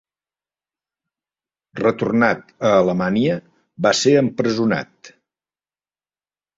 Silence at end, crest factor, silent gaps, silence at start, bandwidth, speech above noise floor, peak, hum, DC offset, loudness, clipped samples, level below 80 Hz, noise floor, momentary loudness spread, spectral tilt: 1.5 s; 20 dB; none; 1.75 s; 8 kHz; over 73 dB; -2 dBFS; none; under 0.1%; -18 LUFS; under 0.1%; -58 dBFS; under -90 dBFS; 8 LU; -5 dB/octave